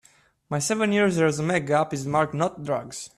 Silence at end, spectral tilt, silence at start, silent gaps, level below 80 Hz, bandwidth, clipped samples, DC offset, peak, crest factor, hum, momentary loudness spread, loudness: 0.1 s; -5 dB/octave; 0.5 s; none; -60 dBFS; 13.5 kHz; under 0.1%; under 0.1%; -8 dBFS; 16 dB; none; 8 LU; -24 LUFS